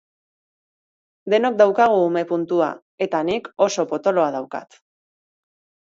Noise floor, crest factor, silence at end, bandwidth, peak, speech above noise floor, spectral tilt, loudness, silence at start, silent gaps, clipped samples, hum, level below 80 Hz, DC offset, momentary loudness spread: under -90 dBFS; 20 dB; 1.2 s; 7.8 kHz; -2 dBFS; over 71 dB; -5 dB/octave; -20 LUFS; 1.25 s; 2.82-2.98 s; under 0.1%; none; -68 dBFS; under 0.1%; 12 LU